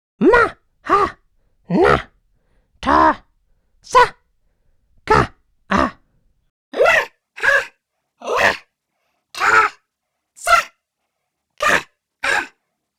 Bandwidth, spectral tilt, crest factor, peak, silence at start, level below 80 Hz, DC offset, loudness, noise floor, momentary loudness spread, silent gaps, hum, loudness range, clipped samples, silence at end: 17 kHz; -4 dB/octave; 18 dB; 0 dBFS; 0.2 s; -42 dBFS; under 0.1%; -17 LUFS; -77 dBFS; 15 LU; 6.50-6.72 s; none; 2 LU; under 0.1%; 0.5 s